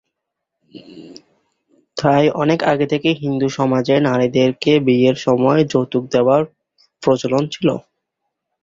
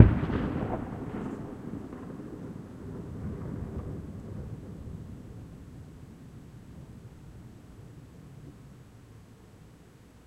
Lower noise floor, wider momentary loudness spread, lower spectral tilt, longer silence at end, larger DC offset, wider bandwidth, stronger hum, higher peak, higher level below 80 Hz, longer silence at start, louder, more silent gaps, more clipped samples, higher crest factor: first, -79 dBFS vs -54 dBFS; second, 6 LU vs 19 LU; second, -6.5 dB/octave vs -9 dB/octave; first, 0.85 s vs 0.05 s; neither; second, 7.6 kHz vs 11 kHz; neither; about the same, -2 dBFS vs 0 dBFS; second, -56 dBFS vs -44 dBFS; first, 0.75 s vs 0 s; first, -16 LUFS vs -35 LUFS; neither; neither; second, 16 dB vs 32 dB